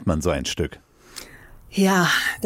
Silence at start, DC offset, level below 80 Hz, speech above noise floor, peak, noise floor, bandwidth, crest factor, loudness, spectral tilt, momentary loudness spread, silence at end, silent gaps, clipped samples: 0 s; under 0.1%; -40 dBFS; 24 dB; -8 dBFS; -45 dBFS; 16.5 kHz; 16 dB; -21 LUFS; -4.5 dB/octave; 21 LU; 0 s; none; under 0.1%